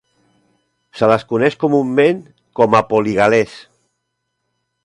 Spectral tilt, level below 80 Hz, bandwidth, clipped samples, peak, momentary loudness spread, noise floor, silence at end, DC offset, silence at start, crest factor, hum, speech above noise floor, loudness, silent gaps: -6.5 dB/octave; -54 dBFS; 11 kHz; under 0.1%; 0 dBFS; 7 LU; -73 dBFS; 1.25 s; under 0.1%; 0.95 s; 18 dB; none; 59 dB; -15 LUFS; none